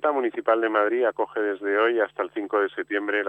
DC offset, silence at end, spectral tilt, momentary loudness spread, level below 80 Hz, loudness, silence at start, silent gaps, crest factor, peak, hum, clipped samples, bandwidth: under 0.1%; 0 s; -5.5 dB/octave; 5 LU; -76 dBFS; -24 LUFS; 0 s; none; 16 dB; -8 dBFS; none; under 0.1%; 8.4 kHz